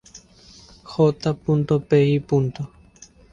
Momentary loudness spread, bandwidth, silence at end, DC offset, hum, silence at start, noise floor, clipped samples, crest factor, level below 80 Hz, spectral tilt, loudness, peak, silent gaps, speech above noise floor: 14 LU; 7.6 kHz; 0.65 s; under 0.1%; none; 0.15 s; -49 dBFS; under 0.1%; 16 dB; -52 dBFS; -8 dB/octave; -21 LUFS; -6 dBFS; none; 30 dB